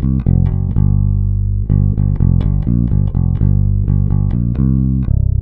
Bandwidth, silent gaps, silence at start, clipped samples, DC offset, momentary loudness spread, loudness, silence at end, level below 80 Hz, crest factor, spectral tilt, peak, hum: 2.1 kHz; none; 0 s; under 0.1%; under 0.1%; 2 LU; -15 LUFS; 0 s; -18 dBFS; 12 dB; -13.5 dB/octave; -2 dBFS; 50 Hz at -25 dBFS